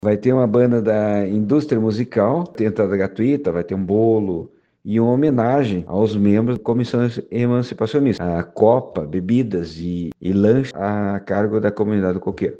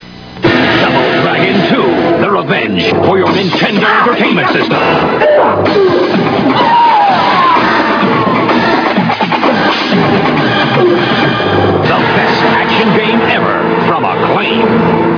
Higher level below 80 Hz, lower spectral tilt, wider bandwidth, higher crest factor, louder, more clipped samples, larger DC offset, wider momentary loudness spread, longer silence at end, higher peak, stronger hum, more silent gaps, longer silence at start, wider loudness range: second, -50 dBFS vs -44 dBFS; first, -9 dB/octave vs -6.5 dB/octave; first, 8 kHz vs 5.4 kHz; first, 18 dB vs 10 dB; second, -19 LUFS vs -9 LUFS; second, under 0.1% vs 0.3%; neither; first, 7 LU vs 3 LU; about the same, 0 s vs 0 s; about the same, 0 dBFS vs 0 dBFS; neither; neither; about the same, 0.05 s vs 0 s; about the same, 2 LU vs 1 LU